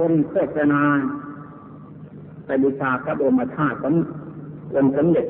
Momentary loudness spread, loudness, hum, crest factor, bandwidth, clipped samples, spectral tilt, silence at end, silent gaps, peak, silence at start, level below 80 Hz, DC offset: 22 LU; -21 LUFS; none; 14 dB; 3.6 kHz; under 0.1%; -13 dB/octave; 0 s; none; -8 dBFS; 0 s; -56 dBFS; under 0.1%